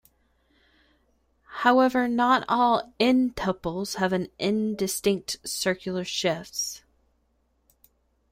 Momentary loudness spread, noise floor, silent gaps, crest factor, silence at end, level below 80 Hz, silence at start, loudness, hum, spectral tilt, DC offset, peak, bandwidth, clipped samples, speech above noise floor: 9 LU; -70 dBFS; none; 22 dB; 1.55 s; -58 dBFS; 1.5 s; -25 LUFS; none; -4 dB/octave; under 0.1%; -4 dBFS; 16 kHz; under 0.1%; 45 dB